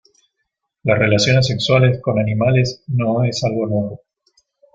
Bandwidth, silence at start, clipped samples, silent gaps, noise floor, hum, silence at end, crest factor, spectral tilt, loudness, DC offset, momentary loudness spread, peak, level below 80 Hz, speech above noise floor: 7.8 kHz; 0.85 s; under 0.1%; none; -75 dBFS; none; 0.8 s; 16 dB; -6 dB/octave; -17 LUFS; under 0.1%; 7 LU; -2 dBFS; -48 dBFS; 59 dB